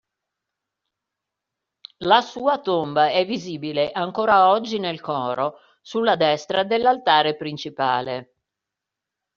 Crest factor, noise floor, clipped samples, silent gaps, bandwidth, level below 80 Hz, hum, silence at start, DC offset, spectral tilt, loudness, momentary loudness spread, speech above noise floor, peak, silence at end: 20 dB; -85 dBFS; under 0.1%; none; 7.2 kHz; -64 dBFS; none; 2 s; under 0.1%; -2 dB/octave; -21 LUFS; 11 LU; 64 dB; -2 dBFS; 1.15 s